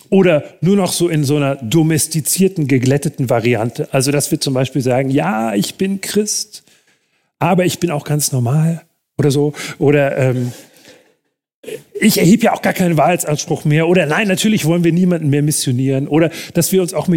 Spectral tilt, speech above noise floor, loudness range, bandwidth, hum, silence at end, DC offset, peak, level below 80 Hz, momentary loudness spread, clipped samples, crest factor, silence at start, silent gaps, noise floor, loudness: -5 dB/octave; 48 dB; 4 LU; 17 kHz; none; 0 s; under 0.1%; 0 dBFS; -54 dBFS; 6 LU; under 0.1%; 14 dB; 0.1 s; 11.54-11.63 s; -63 dBFS; -15 LUFS